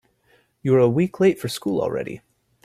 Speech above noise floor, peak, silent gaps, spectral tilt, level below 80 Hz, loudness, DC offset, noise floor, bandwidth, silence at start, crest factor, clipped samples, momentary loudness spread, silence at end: 41 dB; -6 dBFS; none; -7 dB/octave; -58 dBFS; -21 LUFS; under 0.1%; -61 dBFS; 15 kHz; 0.65 s; 16 dB; under 0.1%; 13 LU; 0.45 s